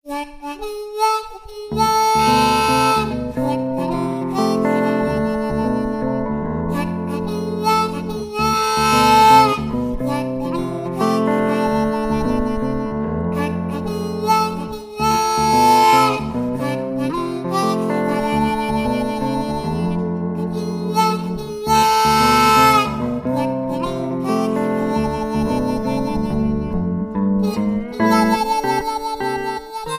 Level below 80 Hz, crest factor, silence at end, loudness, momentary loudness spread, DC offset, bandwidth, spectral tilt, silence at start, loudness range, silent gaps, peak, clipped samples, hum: -38 dBFS; 18 dB; 0 s; -18 LUFS; 10 LU; under 0.1%; 15.5 kHz; -5 dB/octave; 0.05 s; 5 LU; none; 0 dBFS; under 0.1%; none